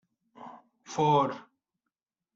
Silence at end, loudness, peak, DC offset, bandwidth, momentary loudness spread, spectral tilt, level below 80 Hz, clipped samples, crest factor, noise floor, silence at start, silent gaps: 0.95 s; -27 LUFS; -14 dBFS; under 0.1%; 7.8 kHz; 24 LU; -5.5 dB/octave; -74 dBFS; under 0.1%; 20 dB; -88 dBFS; 0.4 s; none